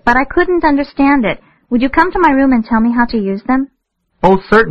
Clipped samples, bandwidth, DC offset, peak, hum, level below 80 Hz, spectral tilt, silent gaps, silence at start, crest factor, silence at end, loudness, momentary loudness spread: 0.1%; 6.8 kHz; 0.5%; 0 dBFS; none; -32 dBFS; -7.5 dB/octave; none; 0.05 s; 12 dB; 0 s; -13 LUFS; 7 LU